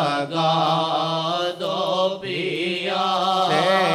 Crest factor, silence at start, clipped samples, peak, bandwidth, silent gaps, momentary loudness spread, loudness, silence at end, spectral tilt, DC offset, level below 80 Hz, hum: 16 dB; 0 s; under 0.1%; -4 dBFS; 15 kHz; none; 5 LU; -21 LUFS; 0 s; -4.5 dB/octave; under 0.1%; -70 dBFS; none